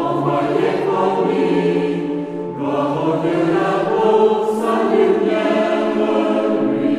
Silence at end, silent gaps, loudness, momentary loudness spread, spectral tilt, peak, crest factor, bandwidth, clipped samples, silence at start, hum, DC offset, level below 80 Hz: 0 s; none; -17 LUFS; 5 LU; -7 dB/octave; -2 dBFS; 14 dB; 12 kHz; under 0.1%; 0 s; none; under 0.1%; -56 dBFS